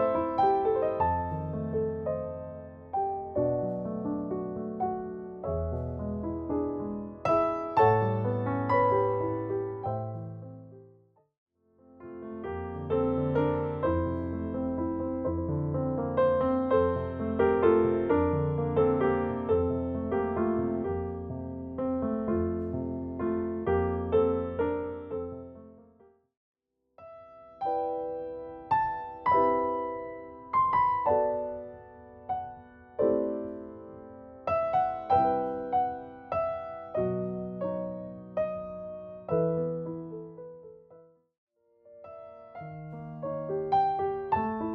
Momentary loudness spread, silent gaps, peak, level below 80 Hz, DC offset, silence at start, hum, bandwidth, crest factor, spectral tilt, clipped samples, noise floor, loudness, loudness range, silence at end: 17 LU; 11.38-11.47 s, 26.37-26.54 s, 41.38-41.47 s; -12 dBFS; -56 dBFS; under 0.1%; 0 s; none; 6.2 kHz; 18 dB; -10.5 dB/octave; under 0.1%; -62 dBFS; -30 LUFS; 9 LU; 0 s